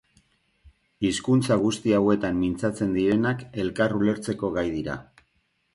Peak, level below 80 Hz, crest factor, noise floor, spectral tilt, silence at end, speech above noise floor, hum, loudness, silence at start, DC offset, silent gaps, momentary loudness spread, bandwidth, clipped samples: -8 dBFS; -52 dBFS; 18 dB; -71 dBFS; -6 dB/octave; 0.7 s; 47 dB; none; -25 LUFS; 0.65 s; under 0.1%; none; 8 LU; 11.5 kHz; under 0.1%